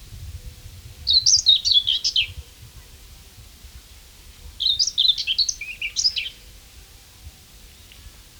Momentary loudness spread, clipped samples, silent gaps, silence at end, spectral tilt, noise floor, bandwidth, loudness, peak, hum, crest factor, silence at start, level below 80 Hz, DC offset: 25 LU; under 0.1%; none; 0.2 s; 1.5 dB/octave; -46 dBFS; over 20 kHz; -18 LUFS; -4 dBFS; none; 22 dB; 0 s; -46 dBFS; under 0.1%